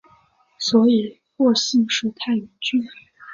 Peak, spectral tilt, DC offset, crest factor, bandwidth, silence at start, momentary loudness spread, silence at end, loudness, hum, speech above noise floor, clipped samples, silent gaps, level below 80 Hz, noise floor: -4 dBFS; -4 dB/octave; under 0.1%; 18 dB; 7.6 kHz; 0.6 s; 9 LU; 0 s; -20 LUFS; none; 38 dB; under 0.1%; none; -66 dBFS; -57 dBFS